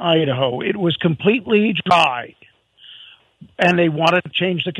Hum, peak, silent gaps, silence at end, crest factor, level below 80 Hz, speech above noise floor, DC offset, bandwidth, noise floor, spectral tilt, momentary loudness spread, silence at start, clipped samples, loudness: none; 0 dBFS; none; 0 s; 18 dB; -60 dBFS; 32 dB; under 0.1%; 11 kHz; -50 dBFS; -6 dB/octave; 5 LU; 0 s; under 0.1%; -17 LUFS